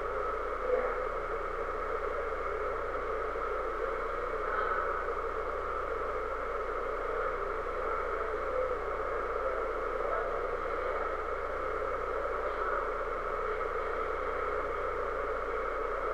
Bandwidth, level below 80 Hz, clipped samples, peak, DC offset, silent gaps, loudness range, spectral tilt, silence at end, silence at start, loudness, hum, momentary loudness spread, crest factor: 12 kHz; -44 dBFS; under 0.1%; -18 dBFS; 0.4%; none; 1 LU; -6 dB/octave; 0 s; 0 s; -34 LUFS; none; 3 LU; 16 dB